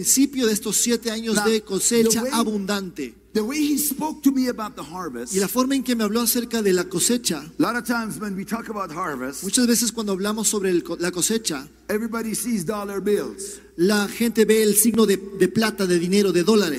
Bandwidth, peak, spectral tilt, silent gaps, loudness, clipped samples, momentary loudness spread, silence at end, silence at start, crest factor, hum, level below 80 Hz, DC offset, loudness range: 16 kHz; -4 dBFS; -3.5 dB/octave; none; -21 LUFS; under 0.1%; 11 LU; 0 s; 0 s; 18 dB; none; -54 dBFS; under 0.1%; 4 LU